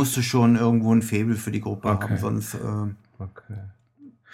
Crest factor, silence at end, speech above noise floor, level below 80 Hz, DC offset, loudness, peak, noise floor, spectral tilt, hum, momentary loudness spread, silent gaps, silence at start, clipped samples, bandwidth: 16 dB; 0.25 s; 28 dB; -56 dBFS; under 0.1%; -23 LUFS; -6 dBFS; -51 dBFS; -6 dB/octave; none; 20 LU; none; 0 s; under 0.1%; 16.5 kHz